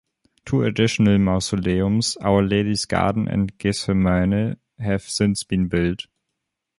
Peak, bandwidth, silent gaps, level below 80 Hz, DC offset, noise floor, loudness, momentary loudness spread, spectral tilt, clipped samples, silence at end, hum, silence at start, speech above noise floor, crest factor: -4 dBFS; 11.5 kHz; none; -40 dBFS; under 0.1%; -80 dBFS; -21 LUFS; 7 LU; -5.5 dB/octave; under 0.1%; 0.75 s; none; 0.45 s; 60 dB; 18 dB